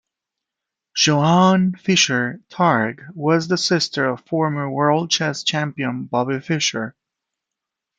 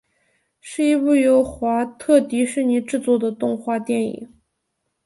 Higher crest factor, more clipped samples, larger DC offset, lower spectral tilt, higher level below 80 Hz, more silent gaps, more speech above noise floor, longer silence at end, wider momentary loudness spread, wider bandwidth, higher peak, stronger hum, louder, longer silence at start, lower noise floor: about the same, 18 dB vs 16 dB; neither; neither; about the same, -4 dB/octave vs -5 dB/octave; second, -64 dBFS vs -56 dBFS; neither; first, 65 dB vs 56 dB; first, 1.1 s vs 0.8 s; about the same, 10 LU vs 8 LU; second, 9 kHz vs 11.5 kHz; about the same, -2 dBFS vs -4 dBFS; neither; about the same, -19 LUFS vs -19 LUFS; first, 0.95 s vs 0.65 s; first, -84 dBFS vs -75 dBFS